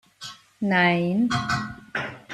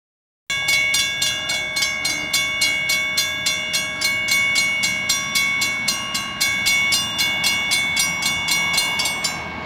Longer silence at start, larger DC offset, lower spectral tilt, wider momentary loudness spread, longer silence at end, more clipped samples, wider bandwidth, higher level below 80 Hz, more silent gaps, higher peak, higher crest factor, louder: second, 0.2 s vs 0.5 s; neither; first, -5.5 dB/octave vs 0 dB/octave; first, 20 LU vs 5 LU; about the same, 0 s vs 0 s; neither; second, 12 kHz vs over 20 kHz; second, -56 dBFS vs -50 dBFS; neither; second, -8 dBFS vs -4 dBFS; about the same, 18 dB vs 18 dB; second, -24 LUFS vs -18 LUFS